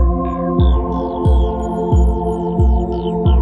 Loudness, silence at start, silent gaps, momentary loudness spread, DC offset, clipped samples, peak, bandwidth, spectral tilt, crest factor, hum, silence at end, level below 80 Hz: -17 LUFS; 0 s; none; 4 LU; under 0.1%; under 0.1%; -2 dBFS; 7.2 kHz; -9.5 dB/octave; 12 dB; none; 0 s; -16 dBFS